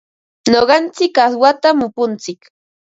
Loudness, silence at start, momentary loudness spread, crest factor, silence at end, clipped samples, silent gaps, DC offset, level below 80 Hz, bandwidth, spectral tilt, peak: -14 LUFS; 0.45 s; 10 LU; 14 dB; 0.55 s; under 0.1%; none; under 0.1%; -54 dBFS; 7.8 kHz; -3.5 dB/octave; 0 dBFS